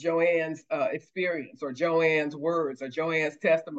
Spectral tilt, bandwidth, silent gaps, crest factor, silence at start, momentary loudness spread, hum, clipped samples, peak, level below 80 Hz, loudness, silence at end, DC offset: -6 dB/octave; 7.8 kHz; none; 16 dB; 0 s; 7 LU; none; under 0.1%; -12 dBFS; -82 dBFS; -28 LUFS; 0 s; under 0.1%